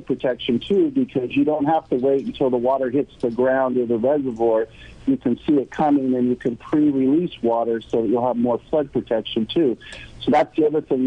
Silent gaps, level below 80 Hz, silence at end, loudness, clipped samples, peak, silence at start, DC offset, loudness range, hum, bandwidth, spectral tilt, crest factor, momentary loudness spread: none; -52 dBFS; 0 s; -21 LUFS; under 0.1%; -8 dBFS; 0 s; under 0.1%; 1 LU; none; 8.8 kHz; -8 dB/octave; 12 dB; 5 LU